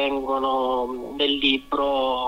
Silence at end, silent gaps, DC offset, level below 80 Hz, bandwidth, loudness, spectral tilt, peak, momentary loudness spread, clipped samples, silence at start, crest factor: 0 s; none; under 0.1%; -50 dBFS; 15.5 kHz; -23 LUFS; -4 dB/octave; -6 dBFS; 5 LU; under 0.1%; 0 s; 18 dB